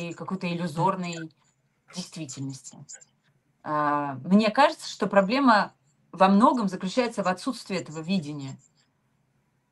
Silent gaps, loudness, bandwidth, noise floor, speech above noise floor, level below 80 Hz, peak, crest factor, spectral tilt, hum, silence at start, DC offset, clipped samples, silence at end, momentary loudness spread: none; -25 LUFS; 12 kHz; -70 dBFS; 45 dB; -70 dBFS; -4 dBFS; 22 dB; -5.5 dB/octave; none; 0 s; under 0.1%; under 0.1%; 1.15 s; 21 LU